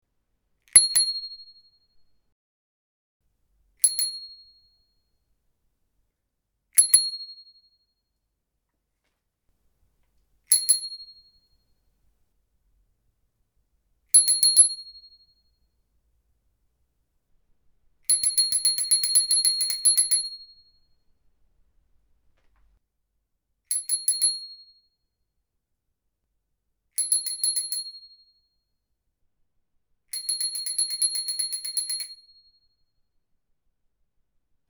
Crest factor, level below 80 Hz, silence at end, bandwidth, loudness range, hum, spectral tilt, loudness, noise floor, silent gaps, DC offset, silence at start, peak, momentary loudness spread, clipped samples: 26 dB; -68 dBFS; 2.55 s; over 20 kHz; 10 LU; none; 4.5 dB/octave; -20 LUFS; -79 dBFS; 2.32-3.20 s; under 0.1%; 0.75 s; -2 dBFS; 19 LU; under 0.1%